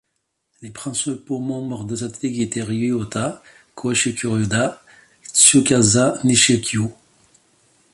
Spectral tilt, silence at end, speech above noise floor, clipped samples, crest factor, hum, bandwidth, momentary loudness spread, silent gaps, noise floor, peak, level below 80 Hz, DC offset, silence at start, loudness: -3.5 dB/octave; 1 s; 55 dB; under 0.1%; 20 dB; none; 12 kHz; 15 LU; none; -74 dBFS; 0 dBFS; -52 dBFS; under 0.1%; 0.6 s; -18 LUFS